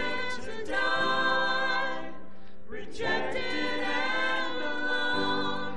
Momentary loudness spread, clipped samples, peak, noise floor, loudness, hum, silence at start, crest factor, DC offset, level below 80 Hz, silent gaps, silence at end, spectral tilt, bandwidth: 13 LU; under 0.1%; -14 dBFS; -51 dBFS; -29 LUFS; none; 0 s; 16 dB; 3%; -60 dBFS; none; 0 s; -3.5 dB/octave; 11.5 kHz